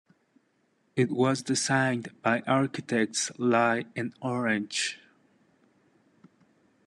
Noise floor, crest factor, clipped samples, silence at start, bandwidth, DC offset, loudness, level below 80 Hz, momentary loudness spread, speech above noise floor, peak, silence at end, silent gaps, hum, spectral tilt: -71 dBFS; 20 dB; under 0.1%; 0.95 s; 12 kHz; under 0.1%; -27 LUFS; -74 dBFS; 8 LU; 43 dB; -10 dBFS; 1.9 s; none; none; -4 dB/octave